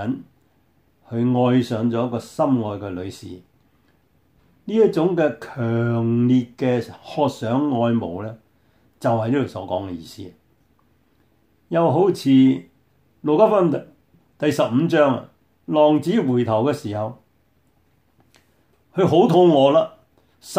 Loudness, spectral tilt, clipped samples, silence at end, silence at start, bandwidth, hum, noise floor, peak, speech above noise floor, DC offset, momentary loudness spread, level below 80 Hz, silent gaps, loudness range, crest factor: -20 LUFS; -7.5 dB/octave; under 0.1%; 0 s; 0 s; 15 kHz; none; -62 dBFS; -2 dBFS; 44 dB; under 0.1%; 15 LU; -64 dBFS; none; 5 LU; 18 dB